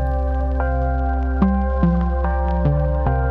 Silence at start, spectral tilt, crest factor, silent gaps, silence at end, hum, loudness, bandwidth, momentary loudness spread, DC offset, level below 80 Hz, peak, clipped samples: 0 s; -11 dB/octave; 16 dB; none; 0 s; none; -20 LUFS; 3.3 kHz; 3 LU; under 0.1%; -20 dBFS; -2 dBFS; under 0.1%